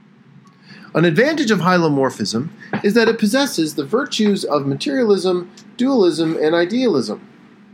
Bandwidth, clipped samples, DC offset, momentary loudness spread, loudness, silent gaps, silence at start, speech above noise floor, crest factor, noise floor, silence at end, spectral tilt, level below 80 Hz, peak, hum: 17 kHz; under 0.1%; under 0.1%; 8 LU; -17 LUFS; none; 0.7 s; 30 dB; 16 dB; -47 dBFS; 0.55 s; -5.5 dB/octave; -70 dBFS; 0 dBFS; none